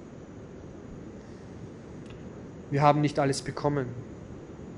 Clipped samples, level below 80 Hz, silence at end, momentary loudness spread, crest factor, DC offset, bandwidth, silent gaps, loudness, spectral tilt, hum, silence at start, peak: under 0.1%; -56 dBFS; 0 s; 21 LU; 24 dB; under 0.1%; 11.5 kHz; none; -27 LUFS; -6.5 dB/octave; none; 0 s; -6 dBFS